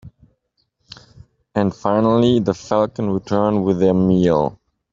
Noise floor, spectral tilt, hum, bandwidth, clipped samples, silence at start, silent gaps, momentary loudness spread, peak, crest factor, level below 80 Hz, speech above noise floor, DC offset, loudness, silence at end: -68 dBFS; -8 dB/octave; none; 7.6 kHz; under 0.1%; 0.05 s; none; 6 LU; -2 dBFS; 16 dB; -50 dBFS; 52 dB; under 0.1%; -18 LUFS; 0.4 s